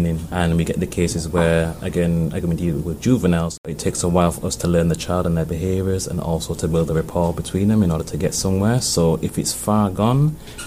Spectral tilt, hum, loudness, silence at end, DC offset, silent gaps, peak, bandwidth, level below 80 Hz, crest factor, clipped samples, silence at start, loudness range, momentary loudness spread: -6 dB/octave; none; -20 LUFS; 0 s; under 0.1%; 3.58-3.64 s; -2 dBFS; 15.5 kHz; -36 dBFS; 16 dB; under 0.1%; 0 s; 2 LU; 5 LU